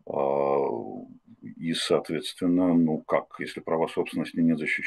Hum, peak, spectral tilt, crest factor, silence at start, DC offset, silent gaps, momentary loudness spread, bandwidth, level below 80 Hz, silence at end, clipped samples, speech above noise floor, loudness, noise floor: none; -8 dBFS; -5.5 dB/octave; 18 dB; 0.05 s; under 0.1%; none; 13 LU; 12.5 kHz; -68 dBFS; 0 s; under 0.1%; 20 dB; -27 LUFS; -46 dBFS